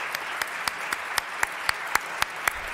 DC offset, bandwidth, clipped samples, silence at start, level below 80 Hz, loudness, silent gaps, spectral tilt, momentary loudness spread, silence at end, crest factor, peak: under 0.1%; 16.5 kHz; under 0.1%; 0 s; -56 dBFS; -28 LUFS; none; 0 dB/octave; 4 LU; 0 s; 24 dB; -6 dBFS